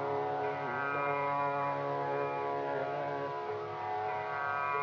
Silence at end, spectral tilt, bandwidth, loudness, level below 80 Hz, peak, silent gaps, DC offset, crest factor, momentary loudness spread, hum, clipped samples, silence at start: 0 s; -4 dB/octave; 7.2 kHz; -35 LUFS; -74 dBFS; -22 dBFS; none; under 0.1%; 12 dB; 5 LU; 50 Hz at -60 dBFS; under 0.1%; 0 s